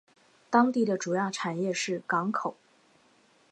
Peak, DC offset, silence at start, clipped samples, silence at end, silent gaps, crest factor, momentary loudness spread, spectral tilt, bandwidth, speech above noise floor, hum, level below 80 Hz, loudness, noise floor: -8 dBFS; under 0.1%; 0.5 s; under 0.1%; 1 s; none; 22 dB; 7 LU; -4.5 dB/octave; 11 kHz; 36 dB; none; -82 dBFS; -28 LUFS; -63 dBFS